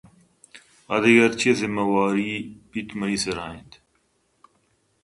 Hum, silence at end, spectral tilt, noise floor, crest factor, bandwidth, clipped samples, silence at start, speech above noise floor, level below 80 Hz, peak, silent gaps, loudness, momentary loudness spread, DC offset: none; 1.45 s; -4.5 dB/octave; -68 dBFS; 20 dB; 11.5 kHz; under 0.1%; 0.55 s; 46 dB; -58 dBFS; -4 dBFS; none; -22 LUFS; 17 LU; under 0.1%